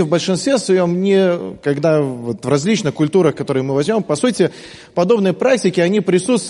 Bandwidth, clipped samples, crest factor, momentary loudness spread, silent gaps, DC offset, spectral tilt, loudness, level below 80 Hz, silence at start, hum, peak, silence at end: 11.5 kHz; under 0.1%; 14 dB; 5 LU; none; under 0.1%; -5.5 dB/octave; -16 LUFS; -58 dBFS; 0 s; none; -2 dBFS; 0 s